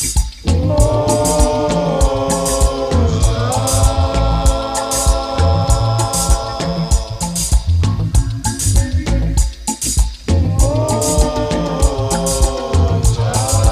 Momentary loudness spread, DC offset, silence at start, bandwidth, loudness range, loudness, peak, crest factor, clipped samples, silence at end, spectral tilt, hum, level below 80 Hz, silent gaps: 4 LU; under 0.1%; 0 s; 15.5 kHz; 2 LU; -16 LUFS; 0 dBFS; 14 dB; under 0.1%; 0 s; -5 dB/octave; none; -18 dBFS; none